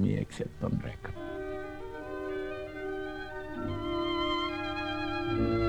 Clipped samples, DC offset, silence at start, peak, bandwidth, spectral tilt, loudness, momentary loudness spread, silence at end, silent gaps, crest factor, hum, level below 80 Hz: under 0.1%; under 0.1%; 0 s; -18 dBFS; 11 kHz; -7 dB/octave; -35 LUFS; 10 LU; 0 s; none; 16 dB; none; -48 dBFS